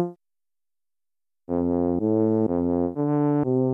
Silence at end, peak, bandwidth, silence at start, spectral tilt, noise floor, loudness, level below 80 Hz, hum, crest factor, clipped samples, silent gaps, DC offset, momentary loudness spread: 0 s; -12 dBFS; 2.8 kHz; 0 s; -13 dB/octave; under -90 dBFS; -24 LUFS; -54 dBFS; none; 14 dB; under 0.1%; none; under 0.1%; 5 LU